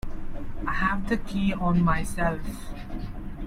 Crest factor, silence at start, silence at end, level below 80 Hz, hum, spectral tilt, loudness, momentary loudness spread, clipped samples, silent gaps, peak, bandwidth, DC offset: 16 dB; 0.05 s; 0 s; -34 dBFS; none; -6.5 dB/octave; -27 LUFS; 15 LU; under 0.1%; none; -10 dBFS; 14 kHz; under 0.1%